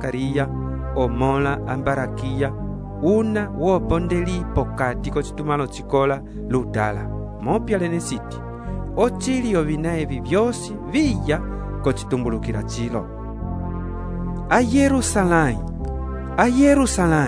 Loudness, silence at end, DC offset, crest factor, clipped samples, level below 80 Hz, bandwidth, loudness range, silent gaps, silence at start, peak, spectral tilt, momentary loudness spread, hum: -22 LUFS; 0 s; under 0.1%; 20 dB; under 0.1%; -32 dBFS; 11 kHz; 4 LU; none; 0 s; -2 dBFS; -6 dB/octave; 11 LU; none